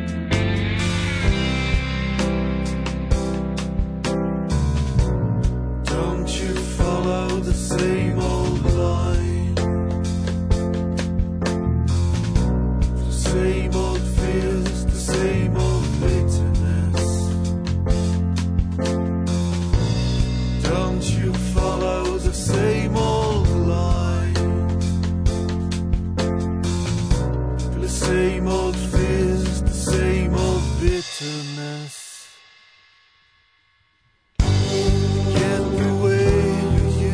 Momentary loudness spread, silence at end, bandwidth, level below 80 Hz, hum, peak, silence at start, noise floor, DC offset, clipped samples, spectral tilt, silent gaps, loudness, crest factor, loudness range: 4 LU; 0 s; 11 kHz; -26 dBFS; none; -4 dBFS; 0 s; -63 dBFS; under 0.1%; under 0.1%; -6 dB/octave; none; -21 LUFS; 16 dB; 3 LU